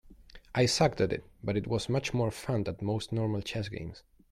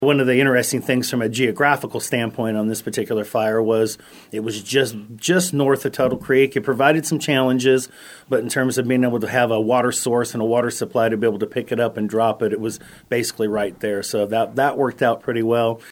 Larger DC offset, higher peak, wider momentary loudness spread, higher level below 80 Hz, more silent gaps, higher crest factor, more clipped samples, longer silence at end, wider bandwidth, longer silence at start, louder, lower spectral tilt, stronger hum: neither; second, -12 dBFS vs 0 dBFS; first, 10 LU vs 7 LU; first, -54 dBFS vs -60 dBFS; neither; about the same, 18 dB vs 20 dB; neither; first, 0.35 s vs 0 s; second, 13.5 kHz vs 17 kHz; about the same, 0.1 s vs 0 s; second, -31 LUFS vs -20 LUFS; about the same, -5.5 dB/octave vs -4.5 dB/octave; neither